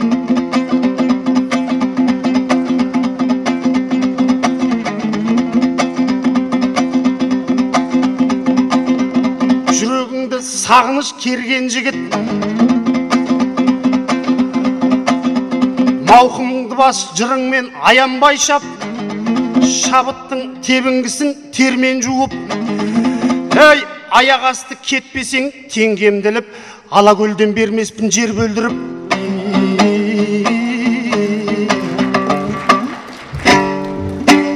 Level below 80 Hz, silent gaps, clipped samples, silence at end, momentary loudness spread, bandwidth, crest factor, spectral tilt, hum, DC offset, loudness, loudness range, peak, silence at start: -48 dBFS; none; under 0.1%; 0 s; 8 LU; 12.5 kHz; 14 dB; -4 dB/octave; none; under 0.1%; -14 LUFS; 3 LU; 0 dBFS; 0 s